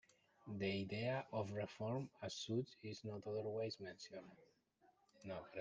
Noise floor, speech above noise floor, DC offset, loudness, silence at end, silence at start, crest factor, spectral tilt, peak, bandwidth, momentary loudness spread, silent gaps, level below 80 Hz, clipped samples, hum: -77 dBFS; 31 dB; under 0.1%; -46 LUFS; 0 s; 0.45 s; 18 dB; -5.5 dB/octave; -30 dBFS; 9.6 kHz; 12 LU; none; -82 dBFS; under 0.1%; none